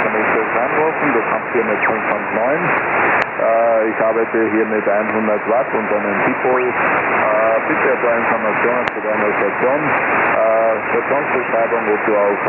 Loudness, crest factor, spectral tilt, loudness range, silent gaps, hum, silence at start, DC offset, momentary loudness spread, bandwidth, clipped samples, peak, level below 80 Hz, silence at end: -16 LUFS; 16 dB; -4 dB/octave; 1 LU; none; none; 0 s; under 0.1%; 3 LU; 4.3 kHz; under 0.1%; 0 dBFS; -56 dBFS; 0 s